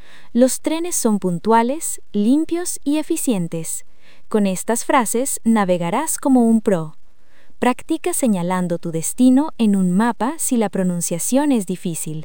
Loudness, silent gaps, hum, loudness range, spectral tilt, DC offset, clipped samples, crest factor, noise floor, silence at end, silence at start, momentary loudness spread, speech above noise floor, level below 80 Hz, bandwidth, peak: -19 LUFS; none; none; 2 LU; -5 dB/octave; 3%; under 0.1%; 18 dB; -44 dBFS; 0 s; 0.35 s; 8 LU; 26 dB; -56 dBFS; 19 kHz; -2 dBFS